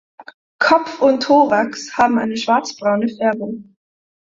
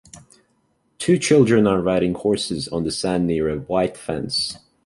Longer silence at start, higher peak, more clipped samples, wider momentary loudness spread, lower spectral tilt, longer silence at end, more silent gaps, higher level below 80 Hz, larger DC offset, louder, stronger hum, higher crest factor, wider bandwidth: about the same, 0.2 s vs 0.15 s; about the same, -2 dBFS vs -4 dBFS; neither; about the same, 9 LU vs 9 LU; about the same, -4.5 dB/octave vs -5 dB/octave; first, 0.6 s vs 0.3 s; first, 0.34-0.59 s vs none; second, -60 dBFS vs -48 dBFS; neither; first, -16 LUFS vs -20 LUFS; neither; about the same, 16 dB vs 18 dB; second, 7.8 kHz vs 11.5 kHz